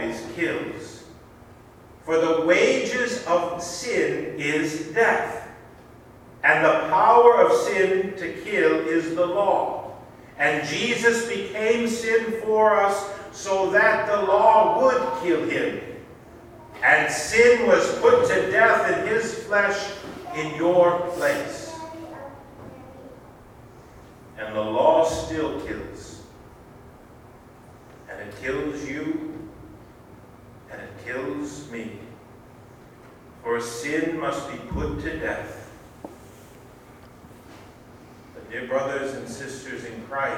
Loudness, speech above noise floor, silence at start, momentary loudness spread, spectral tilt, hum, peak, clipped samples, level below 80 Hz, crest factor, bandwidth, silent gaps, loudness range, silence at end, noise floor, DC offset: -22 LUFS; 26 dB; 0 s; 21 LU; -4 dB/octave; none; -2 dBFS; under 0.1%; -52 dBFS; 22 dB; 16 kHz; none; 16 LU; 0 s; -48 dBFS; under 0.1%